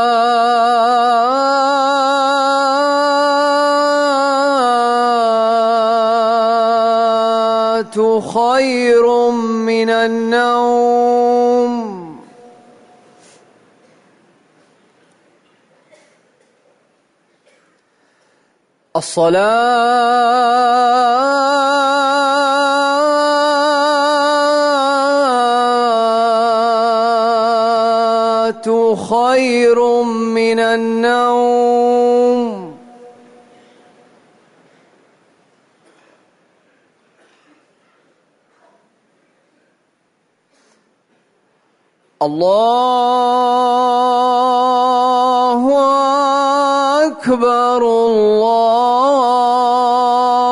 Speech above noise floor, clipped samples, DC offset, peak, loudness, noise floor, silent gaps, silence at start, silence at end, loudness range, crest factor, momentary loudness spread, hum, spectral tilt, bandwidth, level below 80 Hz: 50 dB; under 0.1%; under 0.1%; -4 dBFS; -13 LUFS; -62 dBFS; none; 0 s; 0 s; 5 LU; 10 dB; 3 LU; none; -3.5 dB/octave; 11 kHz; -64 dBFS